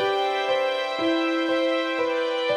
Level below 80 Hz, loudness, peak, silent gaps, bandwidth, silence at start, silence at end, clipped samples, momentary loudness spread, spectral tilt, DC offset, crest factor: -72 dBFS; -24 LUFS; -12 dBFS; none; 11.5 kHz; 0 s; 0 s; under 0.1%; 2 LU; -3.5 dB/octave; under 0.1%; 12 dB